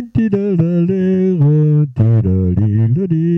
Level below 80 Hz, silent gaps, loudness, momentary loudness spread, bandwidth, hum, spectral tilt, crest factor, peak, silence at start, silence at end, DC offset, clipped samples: -40 dBFS; none; -14 LUFS; 3 LU; 3.4 kHz; none; -12 dB/octave; 8 dB; -4 dBFS; 0 s; 0 s; under 0.1%; under 0.1%